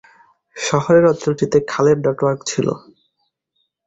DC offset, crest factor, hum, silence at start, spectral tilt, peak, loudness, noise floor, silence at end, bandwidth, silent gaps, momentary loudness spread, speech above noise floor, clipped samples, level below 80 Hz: under 0.1%; 16 dB; none; 0.55 s; -5.5 dB/octave; -2 dBFS; -17 LUFS; -70 dBFS; 1.1 s; 8.2 kHz; none; 9 LU; 54 dB; under 0.1%; -54 dBFS